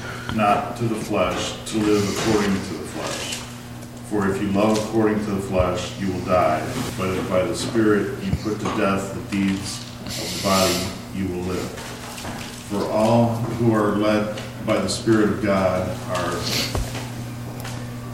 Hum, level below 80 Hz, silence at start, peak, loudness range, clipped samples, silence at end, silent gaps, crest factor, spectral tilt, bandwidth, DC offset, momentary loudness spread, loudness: none; -42 dBFS; 0 s; -6 dBFS; 3 LU; under 0.1%; 0 s; none; 16 dB; -5 dB/octave; 16.5 kHz; under 0.1%; 12 LU; -23 LUFS